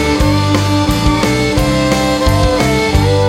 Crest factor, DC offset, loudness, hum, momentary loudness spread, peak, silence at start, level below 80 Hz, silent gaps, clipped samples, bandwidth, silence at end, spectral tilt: 10 dB; 0.1%; -12 LUFS; none; 1 LU; 0 dBFS; 0 s; -20 dBFS; none; under 0.1%; 16 kHz; 0 s; -5.5 dB/octave